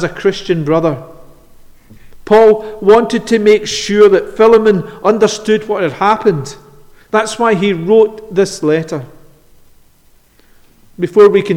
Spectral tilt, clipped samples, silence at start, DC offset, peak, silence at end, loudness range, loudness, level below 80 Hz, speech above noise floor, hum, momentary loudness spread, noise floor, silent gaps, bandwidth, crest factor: -5.5 dB/octave; under 0.1%; 0 s; under 0.1%; 0 dBFS; 0 s; 6 LU; -12 LUFS; -44 dBFS; 37 dB; none; 9 LU; -48 dBFS; none; 11 kHz; 12 dB